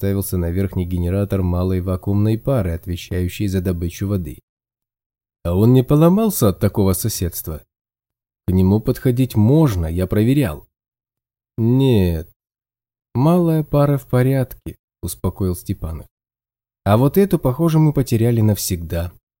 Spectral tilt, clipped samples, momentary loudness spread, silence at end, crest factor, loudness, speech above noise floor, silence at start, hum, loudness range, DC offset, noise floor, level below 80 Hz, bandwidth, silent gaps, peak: -7 dB/octave; under 0.1%; 13 LU; 0.3 s; 18 dB; -18 LUFS; over 73 dB; 0 s; none; 4 LU; under 0.1%; under -90 dBFS; -40 dBFS; 17 kHz; 4.43-4.57 s, 5.06-5.10 s, 7.81-7.85 s, 12.36-12.40 s, 14.79-14.88 s, 16.11-16.17 s; 0 dBFS